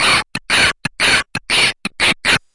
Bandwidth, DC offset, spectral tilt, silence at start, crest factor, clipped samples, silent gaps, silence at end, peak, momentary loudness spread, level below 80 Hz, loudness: 11.5 kHz; under 0.1%; -1 dB/octave; 0 s; 14 dB; under 0.1%; none; 0.15 s; -2 dBFS; 3 LU; -40 dBFS; -14 LUFS